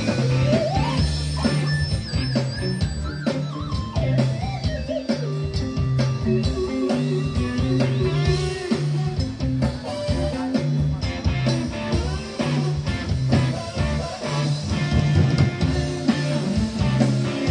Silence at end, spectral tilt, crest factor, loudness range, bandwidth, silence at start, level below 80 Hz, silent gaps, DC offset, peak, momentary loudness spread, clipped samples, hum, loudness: 0 s; -6.5 dB/octave; 18 dB; 2 LU; 10 kHz; 0 s; -32 dBFS; none; under 0.1%; -4 dBFS; 5 LU; under 0.1%; none; -23 LUFS